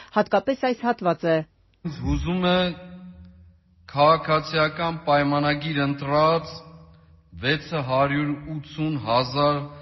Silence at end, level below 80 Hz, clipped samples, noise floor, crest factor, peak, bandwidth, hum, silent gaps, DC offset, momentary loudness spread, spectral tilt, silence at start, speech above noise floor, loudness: 0 s; -44 dBFS; under 0.1%; -53 dBFS; 18 dB; -6 dBFS; 6.2 kHz; none; none; under 0.1%; 13 LU; -4.5 dB/octave; 0 s; 30 dB; -23 LUFS